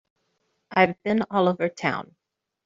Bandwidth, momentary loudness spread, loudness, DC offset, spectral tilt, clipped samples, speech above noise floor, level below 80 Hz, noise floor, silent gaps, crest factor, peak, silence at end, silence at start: 7.6 kHz; 6 LU; -24 LUFS; under 0.1%; -4.5 dB/octave; under 0.1%; 50 dB; -68 dBFS; -73 dBFS; none; 22 dB; -4 dBFS; 0.65 s; 0.7 s